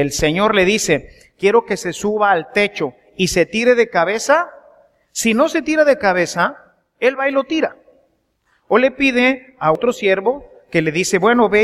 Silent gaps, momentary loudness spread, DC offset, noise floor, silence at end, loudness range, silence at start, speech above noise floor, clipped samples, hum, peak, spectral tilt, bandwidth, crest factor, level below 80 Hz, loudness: none; 7 LU; under 0.1%; -63 dBFS; 0 s; 2 LU; 0 s; 47 dB; under 0.1%; none; 0 dBFS; -4 dB/octave; 15 kHz; 16 dB; -46 dBFS; -16 LUFS